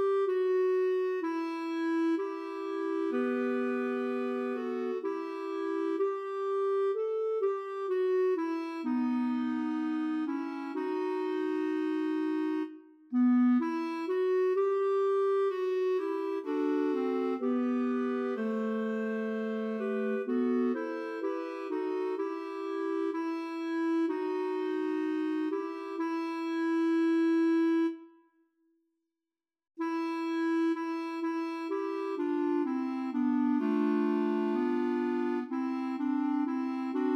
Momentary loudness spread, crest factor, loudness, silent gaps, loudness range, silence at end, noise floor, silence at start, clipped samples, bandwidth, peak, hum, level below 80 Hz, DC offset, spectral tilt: 7 LU; 12 dB; -31 LUFS; none; 4 LU; 0 s; under -90 dBFS; 0 s; under 0.1%; 8 kHz; -20 dBFS; none; under -90 dBFS; under 0.1%; -6.5 dB/octave